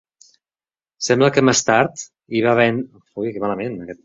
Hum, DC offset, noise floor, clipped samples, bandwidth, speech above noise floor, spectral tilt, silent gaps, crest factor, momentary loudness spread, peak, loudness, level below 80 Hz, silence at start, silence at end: none; under 0.1%; under -90 dBFS; under 0.1%; 8.2 kHz; over 72 dB; -4 dB/octave; none; 18 dB; 13 LU; -2 dBFS; -18 LUFS; -58 dBFS; 1 s; 0.1 s